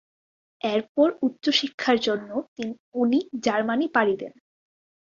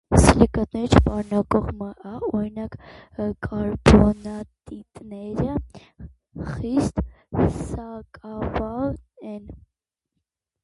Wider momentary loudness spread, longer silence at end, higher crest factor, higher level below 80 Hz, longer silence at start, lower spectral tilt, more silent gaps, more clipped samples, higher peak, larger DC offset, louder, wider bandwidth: second, 10 LU vs 22 LU; second, 0.85 s vs 1.1 s; about the same, 20 dB vs 22 dB; second, -70 dBFS vs -32 dBFS; first, 0.65 s vs 0.1 s; second, -4 dB/octave vs -6.5 dB/octave; first, 0.89-0.95 s, 1.74-1.78 s, 2.48-2.56 s, 2.80-2.92 s vs none; neither; second, -6 dBFS vs 0 dBFS; neither; about the same, -24 LUFS vs -22 LUFS; second, 7.4 kHz vs 11.5 kHz